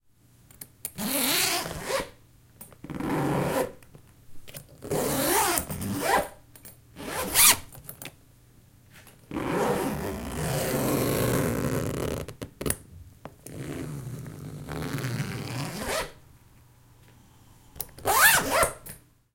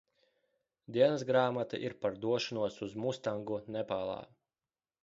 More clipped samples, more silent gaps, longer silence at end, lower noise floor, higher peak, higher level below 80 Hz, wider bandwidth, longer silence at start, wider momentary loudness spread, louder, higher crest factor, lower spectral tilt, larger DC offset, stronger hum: neither; neither; second, 0.35 s vs 0.75 s; second, -59 dBFS vs under -90 dBFS; first, -4 dBFS vs -14 dBFS; first, -50 dBFS vs -72 dBFS; first, 17 kHz vs 7.6 kHz; second, 0.6 s vs 0.9 s; first, 23 LU vs 9 LU; first, -26 LUFS vs -34 LUFS; first, 26 dB vs 20 dB; second, -3 dB/octave vs -4.5 dB/octave; neither; neither